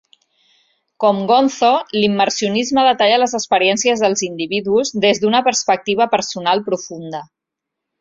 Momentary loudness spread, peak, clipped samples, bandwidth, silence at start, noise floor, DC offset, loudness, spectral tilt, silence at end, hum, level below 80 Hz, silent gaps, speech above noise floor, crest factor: 7 LU; -2 dBFS; under 0.1%; 7.8 kHz; 1 s; -81 dBFS; under 0.1%; -16 LUFS; -3 dB/octave; 0.8 s; none; -60 dBFS; none; 66 dB; 16 dB